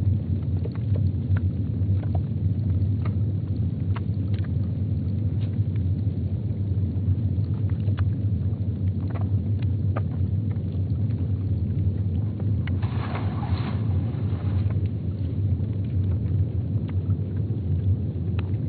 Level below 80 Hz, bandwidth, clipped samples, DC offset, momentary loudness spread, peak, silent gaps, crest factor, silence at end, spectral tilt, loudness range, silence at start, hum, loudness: -40 dBFS; 4.5 kHz; under 0.1%; under 0.1%; 2 LU; -12 dBFS; none; 12 dB; 0 s; -10 dB/octave; 1 LU; 0 s; none; -26 LUFS